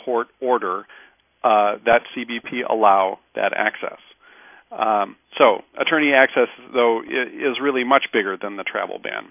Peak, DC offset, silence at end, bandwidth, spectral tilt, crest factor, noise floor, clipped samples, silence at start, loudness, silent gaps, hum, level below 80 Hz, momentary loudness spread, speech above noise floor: 0 dBFS; under 0.1%; 0.1 s; 3.7 kHz; -7.5 dB/octave; 20 dB; -48 dBFS; under 0.1%; 0.05 s; -20 LUFS; none; none; -66 dBFS; 11 LU; 28 dB